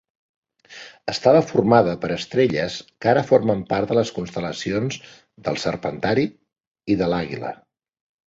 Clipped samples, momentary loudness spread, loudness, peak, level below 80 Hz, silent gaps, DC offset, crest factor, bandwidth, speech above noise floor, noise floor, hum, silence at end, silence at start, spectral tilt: under 0.1%; 15 LU; -21 LUFS; -2 dBFS; -52 dBFS; 6.67-6.75 s; under 0.1%; 20 dB; 8 kHz; 23 dB; -43 dBFS; none; 0.75 s; 0.7 s; -6 dB/octave